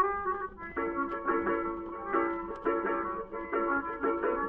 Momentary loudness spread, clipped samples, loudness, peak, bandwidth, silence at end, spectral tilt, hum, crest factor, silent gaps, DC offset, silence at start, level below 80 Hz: 6 LU; under 0.1%; -32 LUFS; -16 dBFS; 3.7 kHz; 0 s; -5 dB/octave; none; 16 dB; none; under 0.1%; 0 s; -56 dBFS